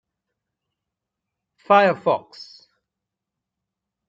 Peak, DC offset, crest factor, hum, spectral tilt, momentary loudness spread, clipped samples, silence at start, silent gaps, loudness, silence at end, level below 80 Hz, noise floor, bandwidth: -4 dBFS; under 0.1%; 22 dB; none; -6 dB/octave; 25 LU; under 0.1%; 1.7 s; none; -19 LUFS; 1.65 s; -76 dBFS; -84 dBFS; 7.6 kHz